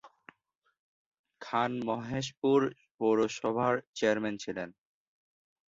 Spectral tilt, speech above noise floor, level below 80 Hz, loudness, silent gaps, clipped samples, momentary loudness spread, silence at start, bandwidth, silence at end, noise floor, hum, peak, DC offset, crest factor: -5.5 dB/octave; 46 dB; -68 dBFS; -31 LUFS; 0.58-0.62 s, 0.79-1.12 s, 1.19-1.24 s, 2.37-2.42 s, 2.91-2.98 s, 3.87-3.93 s; under 0.1%; 10 LU; 0.05 s; 7.8 kHz; 0.95 s; -77 dBFS; none; -14 dBFS; under 0.1%; 20 dB